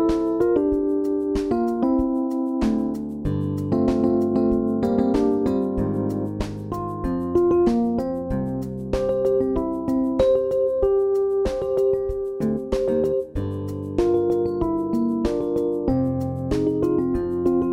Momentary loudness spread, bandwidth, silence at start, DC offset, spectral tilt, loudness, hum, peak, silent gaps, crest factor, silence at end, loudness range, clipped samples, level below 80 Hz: 7 LU; 11.5 kHz; 0 s; under 0.1%; -9 dB/octave; -22 LUFS; none; -8 dBFS; none; 14 dB; 0 s; 2 LU; under 0.1%; -38 dBFS